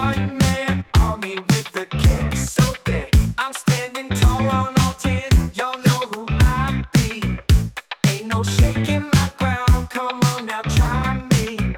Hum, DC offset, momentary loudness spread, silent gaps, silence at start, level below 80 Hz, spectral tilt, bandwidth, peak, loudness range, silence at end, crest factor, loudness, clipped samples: none; under 0.1%; 5 LU; none; 0 s; -24 dBFS; -5.5 dB/octave; 18.5 kHz; -4 dBFS; 1 LU; 0 s; 14 dB; -19 LUFS; under 0.1%